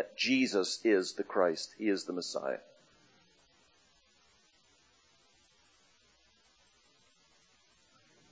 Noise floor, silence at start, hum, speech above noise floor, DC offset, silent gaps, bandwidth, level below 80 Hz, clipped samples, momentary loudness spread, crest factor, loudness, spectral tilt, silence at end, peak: -68 dBFS; 0 s; none; 36 dB; under 0.1%; none; 8 kHz; -82 dBFS; under 0.1%; 8 LU; 22 dB; -32 LUFS; -3 dB/octave; 5.7 s; -16 dBFS